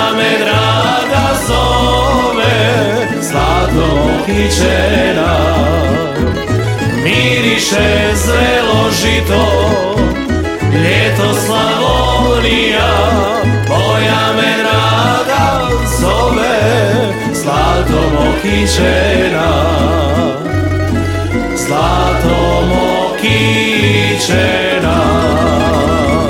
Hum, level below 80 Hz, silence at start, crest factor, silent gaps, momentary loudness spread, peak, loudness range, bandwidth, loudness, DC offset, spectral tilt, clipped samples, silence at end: none; -22 dBFS; 0 s; 12 dB; none; 4 LU; 0 dBFS; 1 LU; 17 kHz; -11 LUFS; under 0.1%; -5 dB/octave; under 0.1%; 0 s